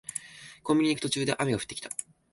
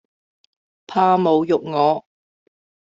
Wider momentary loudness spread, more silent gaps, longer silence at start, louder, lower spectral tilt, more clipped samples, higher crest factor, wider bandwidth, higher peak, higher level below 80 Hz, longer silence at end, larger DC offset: first, 13 LU vs 8 LU; neither; second, 0.1 s vs 0.9 s; second, -29 LUFS vs -18 LUFS; second, -4 dB/octave vs -7.5 dB/octave; neither; about the same, 18 dB vs 16 dB; first, 12 kHz vs 7.6 kHz; second, -12 dBFS vs -4 dBFS; first, -62 dBFS vs -68 dBFS; second, 0.3 s vs 0.9 s; neither